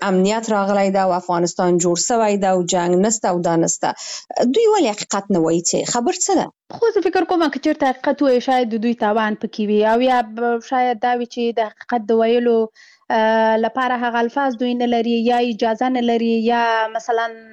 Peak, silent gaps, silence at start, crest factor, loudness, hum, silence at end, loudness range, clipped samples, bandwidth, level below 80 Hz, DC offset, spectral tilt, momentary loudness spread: -8 dBFS; none; 0 s; 10 dB; -18 LUFS; none; 0.1 s; 1 LU; under 0.1%; 12 kHz; -60 dBFS; under 0.1%; -4 dB/octave; 5 LU